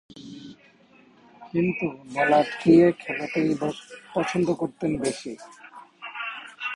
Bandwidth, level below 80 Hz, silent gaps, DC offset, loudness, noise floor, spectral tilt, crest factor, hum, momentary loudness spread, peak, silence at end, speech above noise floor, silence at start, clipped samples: 11 kHz; -60 dBFS; none; under 0.1%; -24 LUFS; -56 dBFS; -6 dB/octave; 22 dB; none; 24 LU; -4 dBFS; 0 s; 32 dB; 0.15 s; under 0.1%